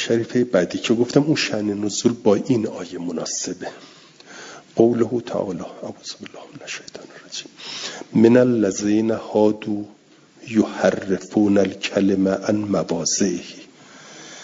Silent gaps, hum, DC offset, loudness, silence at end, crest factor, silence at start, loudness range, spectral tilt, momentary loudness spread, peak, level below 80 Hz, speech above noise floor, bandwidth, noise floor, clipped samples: none; none; under 0.1%; -20 LUFS; 0 s; 20 dB; 0 s; 5 LU; -5 dB/octave; 18 LU; 0 dBFS; -62 dBFS; 24 dB; 7.8 kHz; -44 dBFS; under 0.1%